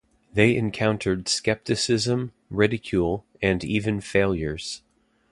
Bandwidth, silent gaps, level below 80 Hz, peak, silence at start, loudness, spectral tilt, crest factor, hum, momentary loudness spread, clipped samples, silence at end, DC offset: 11.5 kHz; none; -46 dBFS; -2 dBFS; 0.35 s; -24 LUFS; -5 dB/octave; 22 dB; none; 9 LU; under 0.1%; 0.55 s; under 0.1%